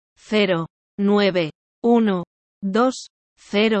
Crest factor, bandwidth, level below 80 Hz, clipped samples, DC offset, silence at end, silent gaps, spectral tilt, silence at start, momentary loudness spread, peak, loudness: 16 dB; 8.6 kHz; -64 dBFS; under 0.1%; under 0.1%; 0 s; 0.70-0.98 s, 1.55-1.82 s, 2.27-2.61 s, 3.10-3.36 s; -6 dB/octave; 0.3 s; 13 LU; -6 dBFS; -21 LUFS